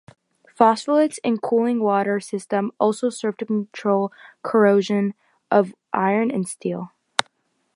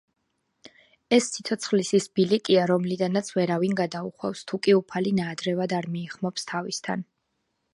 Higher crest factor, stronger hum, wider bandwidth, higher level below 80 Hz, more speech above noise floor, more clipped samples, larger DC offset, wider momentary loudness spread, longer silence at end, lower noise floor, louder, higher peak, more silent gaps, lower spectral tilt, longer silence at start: about the same, 22 dB vs 20 dB; neither; about the same, 11.5 kHz vs 11.5 kHz; about the same, -72 dBFS vs -70 dBFS; second, 45 dB vs 52 dB; neither; neither; about the same, 10 LU vs 10 LU; second, 0.55 s vs 0.7 s; second, -66 dBFS vs -76 dBFS; first, -21 LUFS vs -25 LUFS; first, 0 dBFS vs -6 dBFS; neither; about the same, -5.5 dB/octave vs -5 dB/octave; second, 0.6 s vs 1.1 s